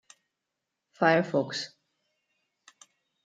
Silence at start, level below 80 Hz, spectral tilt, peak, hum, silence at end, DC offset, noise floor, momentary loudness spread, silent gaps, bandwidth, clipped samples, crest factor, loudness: 1 s; -82 dBFS; -5 dB/octave; -8 dBFS; none; 1.6 s; under 0.1%; -85 dBFS; 13 LU; none; 9.2 kHz; under 0.1%; 24 dB; -27 LUFS